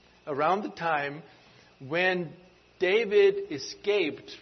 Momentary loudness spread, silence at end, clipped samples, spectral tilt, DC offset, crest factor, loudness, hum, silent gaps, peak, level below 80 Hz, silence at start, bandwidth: 13 LU; 0 s; under 0.1%; -5 dB/octave; under 0.1%; 16 dB; -27 LUFS; none; none; -12 dBFS; -70 dBFS; 0.25 s; 6.4 kHz